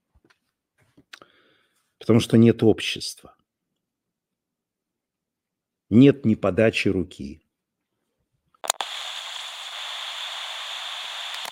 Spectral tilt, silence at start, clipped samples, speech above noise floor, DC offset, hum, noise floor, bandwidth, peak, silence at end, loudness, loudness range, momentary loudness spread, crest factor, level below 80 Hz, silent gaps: -5.5 dB/octave; 2 s; under 0.1%; 66 dB; under 0.1%; none; -85 dBFS; 16.5 kHz; -2 dBFS; 0 s; -22 LUFS; 9 LU; 17 LU; 24 dB; -60 dBFS; none